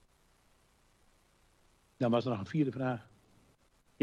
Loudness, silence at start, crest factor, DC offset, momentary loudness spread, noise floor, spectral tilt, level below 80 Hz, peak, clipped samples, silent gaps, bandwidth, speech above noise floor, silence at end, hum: -34 LUFS; 2 s; 20 dB; under 0.1%; 6 LU; -69 dBFS; -8 dB/octave; -72 dBFS; -18 dBFS; under 0.1%; none; 12 kHz; 36 dB; 1 s; none